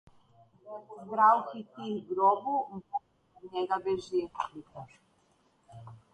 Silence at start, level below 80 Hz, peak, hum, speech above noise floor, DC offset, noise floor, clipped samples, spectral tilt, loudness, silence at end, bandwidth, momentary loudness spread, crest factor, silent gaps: 0.65 s; -72 dBFS; -10 dBFS; none; 38 dB; under 0.1%; -69 dBFS; under 0.1%; -6 dB/octave; -30 LUFS; 0.2 s; 9 kHz; 24 LU; 22 dB; none